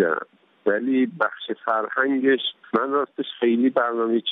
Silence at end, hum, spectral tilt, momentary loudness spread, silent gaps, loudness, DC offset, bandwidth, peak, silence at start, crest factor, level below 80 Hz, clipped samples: 0 s; none; -8 dB/octave; 8 LU; none; -23 LUFS; under 0.1%; 4 kHz; -6 dBFS; 0 s; 18 dB; -78 dBFS; under 0.1%